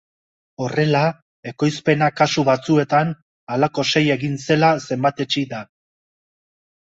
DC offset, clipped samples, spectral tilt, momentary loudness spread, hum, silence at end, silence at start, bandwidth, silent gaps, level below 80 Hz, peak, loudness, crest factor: under 0.1%; under 0.1%; -5.5 dB/octave; 12 LU; none; 1.25 s; 0.6 s; 8 kHz; 1.22-1.43 s, 3.22-3.47 s; -60 dBFS; -2 dBFS; -19 LUFS; 18 dB